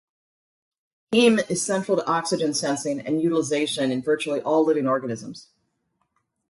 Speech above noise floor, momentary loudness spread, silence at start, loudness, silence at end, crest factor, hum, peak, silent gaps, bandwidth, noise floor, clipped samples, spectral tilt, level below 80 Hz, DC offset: 51 dB; 7 LU; 1.1 s; -23 LUFS; 1.1 s; 18 dB; none; -6 dBFS; none; 11.5 kHz; -73 dBFS; under 0.1%; -4 dB/octave; -70 dBFS; under 0.1%